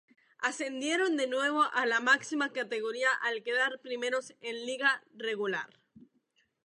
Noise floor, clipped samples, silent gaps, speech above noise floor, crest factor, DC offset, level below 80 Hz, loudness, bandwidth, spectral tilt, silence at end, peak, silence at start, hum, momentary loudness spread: -74 dBFS; under 0.1%; none; 43 dB; 20 dB; under 0.1%; -88 dBFS; -31 LUFS; 11 kHz; -2 dB/octave; 0.65 s; -12 dBFS; 0.4 s; none; 9 LU